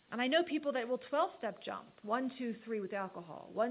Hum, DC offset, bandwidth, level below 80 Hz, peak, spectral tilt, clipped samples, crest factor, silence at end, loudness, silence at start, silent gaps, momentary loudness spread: none; under 0.1%; 4 kHz; -84 dBFS; -20 dBFS; -2 dB/octave; under 0.1%; 18 dB; 0 s; -37 LUFS; 0.1 s; none; 12 LU